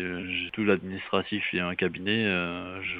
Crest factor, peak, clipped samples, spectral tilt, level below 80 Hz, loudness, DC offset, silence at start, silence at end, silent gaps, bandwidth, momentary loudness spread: 20 dB; -8 dBFS; under 0.1%; -8 dB/octave; -62 dBFS; -28 LUFS; under 0.1%; 0 s; 0 s; none; 5 kHz; 5 LU